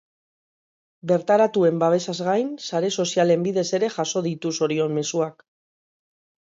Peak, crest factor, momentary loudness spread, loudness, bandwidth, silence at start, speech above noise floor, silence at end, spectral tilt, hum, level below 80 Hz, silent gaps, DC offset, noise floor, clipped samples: -6 dBFS; 16 dB; 7 LU; -22 LUFS; 7.8 kHz; 1.05 s; over 68 dB; 1.2 s; -5 dB/octave; none; -72 dBFS; none; under 0.1%; under -90 dBFS; under 0.1%